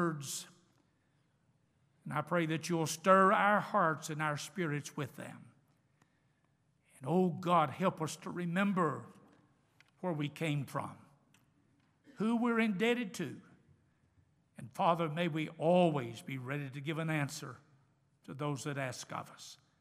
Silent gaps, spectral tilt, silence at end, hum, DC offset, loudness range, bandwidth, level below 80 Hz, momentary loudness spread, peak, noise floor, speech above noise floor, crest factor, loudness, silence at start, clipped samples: none; -5.5 dB/octave; 0.25 s; none; under 0.1%; 8 LU; 15.5 kHz; -82 dBFS; 17 LU; -12 dBFS; -75 dBFS; 41 dB; 24 dB; -34 LUFS; 0 s; under 0.1%